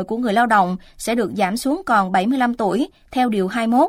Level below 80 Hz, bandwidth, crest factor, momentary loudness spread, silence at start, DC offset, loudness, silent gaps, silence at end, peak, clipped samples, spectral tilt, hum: -50 dBFS; 16 kHz; 16 dB; 7 LU; 0 s; under 0.1%; -19 LUFS; none; 0 s; -4 dBFS; under 0.1%; -5.5 dB/octave; none